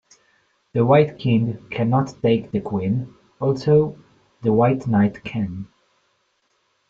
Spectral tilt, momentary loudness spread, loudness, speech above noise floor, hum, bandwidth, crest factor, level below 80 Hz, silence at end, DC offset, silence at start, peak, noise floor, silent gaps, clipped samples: -9 dB/octave; 11 LU; -21 LUFS; 48 dB; none; 7.6 kHz; 18 dB; -56 dBFS; 1.25 s; under 0.1%; 0.75 s; -2 dBFS; -68 dBFS; none; under 0.1%